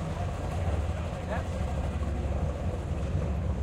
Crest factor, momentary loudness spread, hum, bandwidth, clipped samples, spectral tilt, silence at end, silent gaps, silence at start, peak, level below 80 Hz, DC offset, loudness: 12 dB; 2 LU; none; 11 kHz; under 0.1%; -7.5 dB/octave; 0 s; none; 0 s; -18 dBFS; -36 dBFS; under 0.1%; -32 LUFS